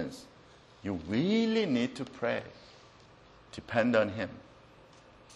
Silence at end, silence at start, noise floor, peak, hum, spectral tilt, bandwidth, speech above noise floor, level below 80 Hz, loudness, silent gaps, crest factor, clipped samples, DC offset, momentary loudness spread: 0 s; 0 s; -57 dBFS; -12 dBFS; none; -6 dB/octave; 11.5 kHz; 26 dB; -64 dBFS; -31 LUFS; none; 22 dB; under 0.1%; under 0.1%; 21 LU